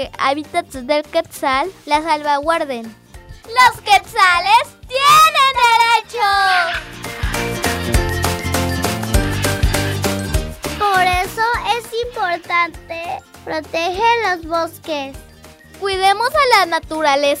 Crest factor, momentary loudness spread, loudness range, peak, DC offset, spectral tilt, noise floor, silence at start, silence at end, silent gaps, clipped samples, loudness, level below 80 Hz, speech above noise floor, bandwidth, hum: 16 dB; 13 LU; 7 LU; -2 dBFS; under 0.1%; -3.5 dB/octave; -41 dBFS; 0 s; 0 s; none; under 0.1%; -16 LUFS; -30 dBFS; 25 dB; 16.5 kHz; none